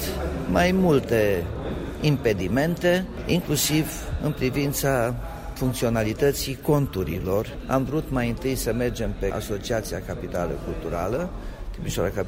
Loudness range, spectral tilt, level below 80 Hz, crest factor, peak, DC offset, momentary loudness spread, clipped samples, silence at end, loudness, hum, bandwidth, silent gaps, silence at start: 5 LU; -5.5 dB/octave; -36 dBFS; 18 dB; -6 dBFS; under 0.1%; 9 LU; under 0.1%; 0 s; -25 LUFS; none; 16 kHz; none; 0 s